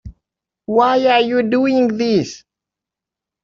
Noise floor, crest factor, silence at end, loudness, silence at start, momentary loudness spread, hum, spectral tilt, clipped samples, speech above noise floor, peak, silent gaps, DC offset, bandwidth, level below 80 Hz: -86 dBFS; 14 dB; 1.05 s; -15 LUFS; 0.05 s; 7 LU; none; -5.5 dB/octave; under 0.1%; 71 dB; -2 dBFS; none; under 0.1%; 7.4 kHz; -50 dBFS